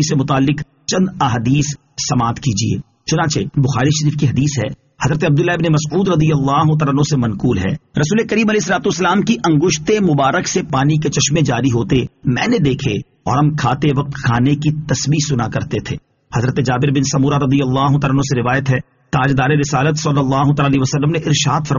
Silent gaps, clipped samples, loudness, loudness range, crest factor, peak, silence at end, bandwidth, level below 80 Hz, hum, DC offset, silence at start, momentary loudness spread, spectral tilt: none; under 0.1%; -16 LUFS; 2 LU; 14 dB; -2 dBFS; 0 s; 7.4 kHz; -40 dBFS; none; under 0.1%; 0 s; 6 LU; -5.5 dB/octave